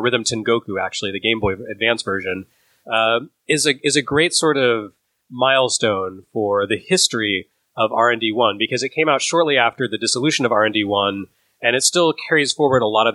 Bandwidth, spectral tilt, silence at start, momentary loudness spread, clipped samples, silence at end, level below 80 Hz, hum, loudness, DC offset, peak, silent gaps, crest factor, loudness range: 12.5 kHz; -3 dB/octave; 0 s; 8 LU; under 0.1%; 0 s; -54 dBFS; none; -18 LUFS; under 0.1%; 0 dBFS; none; 18 dB; 2 LU